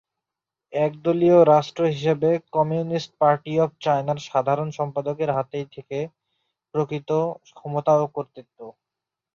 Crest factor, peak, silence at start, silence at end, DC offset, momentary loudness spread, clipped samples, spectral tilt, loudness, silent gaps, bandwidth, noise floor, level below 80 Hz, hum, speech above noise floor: 20 dB; -4 dBFS; 0.7 s; 0.65 s; under 0.1%; 14 LU; under 0.1%; -7.5 dB/octave; -22 LUFS; none; 7.2 kHz; -87 dBFS; -66 dBFS; none; 65 dB